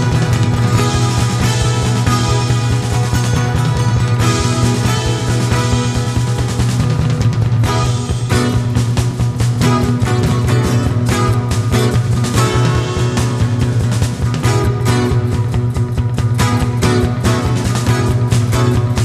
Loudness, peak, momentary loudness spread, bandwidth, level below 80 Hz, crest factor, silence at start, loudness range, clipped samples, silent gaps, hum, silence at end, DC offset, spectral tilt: -15 LUFS; 0 dBFS; 3 LU; 13.5 kHz; -26 dBFS; 12 dB; 0 s; 1 LU; under 0.1%; none; none; 0 s; under 0.1%; -6 dB/octave